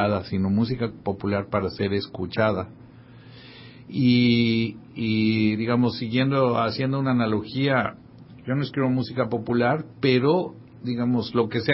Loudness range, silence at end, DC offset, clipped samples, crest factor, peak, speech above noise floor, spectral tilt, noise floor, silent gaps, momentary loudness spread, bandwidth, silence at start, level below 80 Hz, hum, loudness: 4 LU; 0 s; under 0.1%; under 0.1%; 18 dB; -6 dBFS; 23 dB; -11 dB/octave; -46 dBFS; none; 10 LU; 5.8 kHz; 0 s; -52 dBFS; none; -24 LUFS